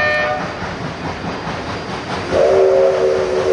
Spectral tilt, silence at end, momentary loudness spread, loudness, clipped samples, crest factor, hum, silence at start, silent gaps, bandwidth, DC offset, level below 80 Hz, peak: -5.5 dB/octave; 0 s; 12 LU; -17 LUFS; under 0.1%; 14 dB; none; 0 s; none; 10.5 kHz; under 0.1%; -40 dBFS; -2 dBFS